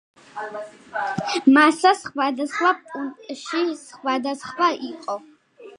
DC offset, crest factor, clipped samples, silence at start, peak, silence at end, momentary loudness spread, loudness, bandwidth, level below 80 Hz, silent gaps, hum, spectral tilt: under 0.1%; 20 dB; under 0.1%; 0.35 s; -2 dBFS; 0.1 s; 18 LU; -22 LUFS; 11 kHz; -70 dBFS; none; none; -4 dB/octave